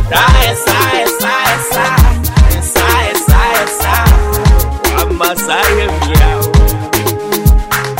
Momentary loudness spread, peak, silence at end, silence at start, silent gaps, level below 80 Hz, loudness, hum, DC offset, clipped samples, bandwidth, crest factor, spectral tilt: 4 LU; 0 dBFS; 0 s; 0 s; none; -12 dBFS; -11 LUFS; none; under 0.1%; 0.2%; 16.5 kHz; 10 dB; -4 dB/octave